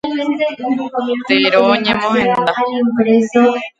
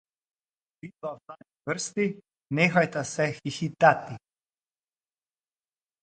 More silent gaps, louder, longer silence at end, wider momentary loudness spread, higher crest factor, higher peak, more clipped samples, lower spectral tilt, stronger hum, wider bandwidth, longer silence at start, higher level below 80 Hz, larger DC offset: neither; first, -14 LUFS vs -26 LUFS; second, 0.1 s vs 1.85 s; second, 7 LU vs 23 LU; second, 14 dB vs 24 dB; first, 0 dBFS vs -4 dBFS; neither; about the same, -5.5 dB/octave vs -5 dB/octave; neither; second, 7.8 kHz vs 9.4 kHz; second, 0.05 s vs 0.85 s; first, -54 dBFS vs -70 dBFS; neither